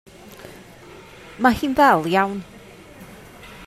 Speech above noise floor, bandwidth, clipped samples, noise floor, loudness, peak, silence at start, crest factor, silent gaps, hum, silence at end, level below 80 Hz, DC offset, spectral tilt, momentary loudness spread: 26 dB; 15.5 kHz; under 0.1%; -43 dBFS; -18 LUFS; -2 dBFS; 0.3 s; 20 dB; none; none; 0 s; -50 dBFS; under 0.1%; -5.5 dB/octave; 26 LU